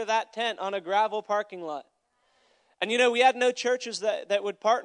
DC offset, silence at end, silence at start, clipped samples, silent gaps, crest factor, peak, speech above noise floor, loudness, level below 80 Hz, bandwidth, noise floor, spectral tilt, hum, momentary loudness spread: under 0.1%; 0 s; 0 s; under 0.1%; none; 20 dB; -8 dBFS; 44 dB; -26 LUFS; -90 dBFS; 10.5 kHz; -70 dBFS; -2 dB/octave; none; 13 LU